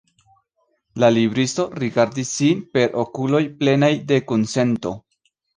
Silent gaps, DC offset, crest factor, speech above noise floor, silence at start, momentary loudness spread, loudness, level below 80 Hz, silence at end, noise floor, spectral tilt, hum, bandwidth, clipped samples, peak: none; under 0.1%; 18 dB; 50 dB; 0.95 s; 7 LU; -19 LUFS; -58 dBFS; 0.6 s; -68 dBFS; -5.5 dB/octave; none; 10 kHz; under 0.1%; -2 dBFS